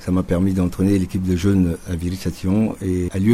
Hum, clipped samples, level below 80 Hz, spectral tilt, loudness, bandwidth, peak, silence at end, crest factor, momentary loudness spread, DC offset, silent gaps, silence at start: none; under 0.1%; -38 dBFS; -7.5 dB/octave; -20 LUFS; 15 kHz; -4 dBFS; 0 s; 14 dB; 7 LU; under 0.1%; none; 0 s